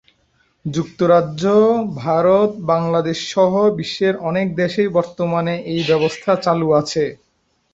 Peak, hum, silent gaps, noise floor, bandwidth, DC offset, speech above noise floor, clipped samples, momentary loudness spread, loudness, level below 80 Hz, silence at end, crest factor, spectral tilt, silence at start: -2 dBFS; none; none; -61 dBFS; 8 kHz; under 0.1%; 45 dB; under 0.1%; 7 LU; -17 LUFS; -54 dBFS; 0.6 s; 16 dB; -6 dB/octave; 0.65 s